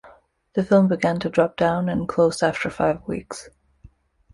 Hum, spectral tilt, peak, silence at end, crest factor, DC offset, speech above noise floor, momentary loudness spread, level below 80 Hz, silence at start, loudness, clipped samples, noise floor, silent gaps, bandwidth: none; -6.5 dB/octave; -6 dBFS; 0.85 s; 18 dB; under 0.1%; 31 dB; 13 LU; -52 dBFS; 0.05 s; -21 LUFS; under 0.1%; -52 dBFS; none; 11.5 kHz